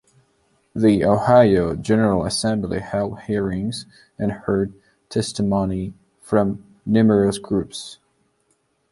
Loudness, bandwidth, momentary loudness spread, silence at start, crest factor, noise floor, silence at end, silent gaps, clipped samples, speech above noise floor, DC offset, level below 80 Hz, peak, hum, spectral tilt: -20 LUFS; 11.5 kHz; 13 LU; 0.75 s; 18 dB; -67 dBFS; 1 s; none; under 0.1%; 47 dB; under 0.1%; -44 dBFS; -2 dBFS; none; -6.5 dB/octave